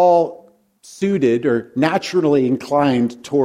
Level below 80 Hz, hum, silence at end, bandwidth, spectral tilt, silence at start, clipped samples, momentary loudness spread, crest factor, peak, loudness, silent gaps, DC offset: -60 dBFS; none; 0 s; 13.5 kHz; -6.5 dB/octave; 0 s; under 0.1%; 5 LU; 16 dB; 0 dBFS; -18 LUFS; none; under 0.1%